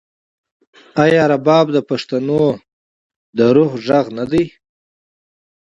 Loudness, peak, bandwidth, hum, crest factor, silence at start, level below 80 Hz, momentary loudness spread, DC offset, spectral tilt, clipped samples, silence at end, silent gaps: -15 LUFS; 0 dBFS; 8 kHz; none; 16 dB; 0.95 s; -52 dBFS; 10 LU; under 0.1%; -7 dB/octave; under 0.1%; 1.15 s; 2.73-3.10 s, 3.16-3.33 s